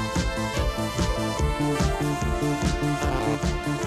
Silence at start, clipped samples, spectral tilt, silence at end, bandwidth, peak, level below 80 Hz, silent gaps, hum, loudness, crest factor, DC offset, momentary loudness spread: 0 s; under 0.1%; -5.5 dB/octave; 0 s; 15.5 kHz; -10 dBFS; -30 dBFS; none; none; -26 LUFS; 14 dB; under 0.1%; 2 LU